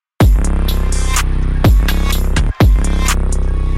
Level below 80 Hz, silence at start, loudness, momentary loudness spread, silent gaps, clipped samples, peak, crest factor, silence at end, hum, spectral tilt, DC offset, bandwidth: -12 dBFS; 0.2 s; -15 LUFS; 5 LU; none; under 0.1%; -2 dBFS; 10 dB; 0 s; none; -5 dB/octave; under 0.1%; 15.5 kHz